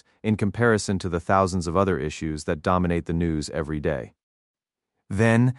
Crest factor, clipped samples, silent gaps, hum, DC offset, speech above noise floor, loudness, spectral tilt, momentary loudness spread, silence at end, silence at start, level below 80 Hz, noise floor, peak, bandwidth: 18 dB; under 0.1%; 4.23-4.54 s; none; under 0.1%; 59 dB; -24 LUFS; -6.5 dB/octave; 8 LU; 0 s; 0.25 s; -44 dBFS; -82 dBFS; -6 dBFS; 11.5 kHz